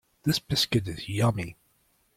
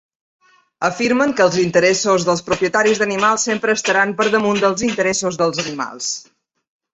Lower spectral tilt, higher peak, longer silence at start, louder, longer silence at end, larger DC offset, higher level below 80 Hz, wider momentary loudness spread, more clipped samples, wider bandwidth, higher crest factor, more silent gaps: first, -5 dB/octave vs -3.5 dB/octave; second, -12 dBFS vs -2 dBFS; second, 0.25 s vs 0.8 s; second, -27 LUFS vs -17 LUFS; about the same, 0.65 s vs 0.7 s; neither; about the same, -54 dBFS vs -54 dBFS; about the same, 10 LU vs 8 LU; neither; first, 16.5 kHz vs 8.4 kHz; about the same, 18 dB vs 16 dB; neither